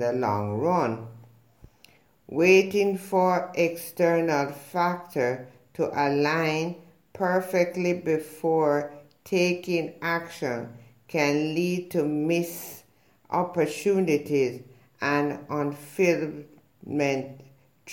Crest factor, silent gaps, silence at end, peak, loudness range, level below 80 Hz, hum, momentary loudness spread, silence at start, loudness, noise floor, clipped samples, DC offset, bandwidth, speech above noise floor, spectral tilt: 20 dB; none; 0 s; -6 dBFS; 4 LU; -70 dBFS; none; 11 LU; 0 s; -26 LUFS; -61 dBFS; under 0.1%; under 0.1%; 17 kHz; 36 dB; -5.5 dB/octave